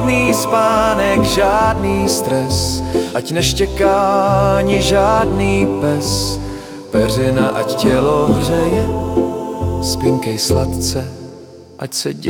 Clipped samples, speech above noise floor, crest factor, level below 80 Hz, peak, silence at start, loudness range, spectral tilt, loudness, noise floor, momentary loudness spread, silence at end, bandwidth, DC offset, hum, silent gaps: under 0.1%; 22 dB; 14 dB; -30 dBFS; 0 dBFS; 0 s; 3 LU; -5 dB/octave; -15 LUFS; -36 dBFS; 8 LU; 0 s; 18 kHz; under 0.1%; none; none